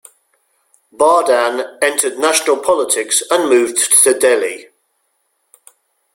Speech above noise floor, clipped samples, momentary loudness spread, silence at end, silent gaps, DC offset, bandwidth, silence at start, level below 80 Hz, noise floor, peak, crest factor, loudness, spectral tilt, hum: 52 dB; under 0.1%; 8 LU; 1.5 s; none; under 0.1%; 17 kHz; 1 s; -62 dBFS; -66 dBFS; 0 dBFS; 16 dB; -13 LUFS; 0 dB/octave; none